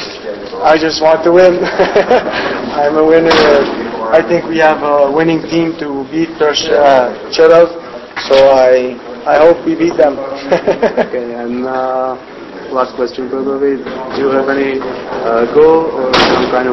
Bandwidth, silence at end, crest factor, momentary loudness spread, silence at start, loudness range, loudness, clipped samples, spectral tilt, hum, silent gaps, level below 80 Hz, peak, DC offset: 8 kHz; 0 s; 10 dB; 12 LU; 0 s; 6 LU; -11 LUFS; 0.5%; -5 dB/octave; none; none; -44 dBFS; 0 dBFS; under 0.1%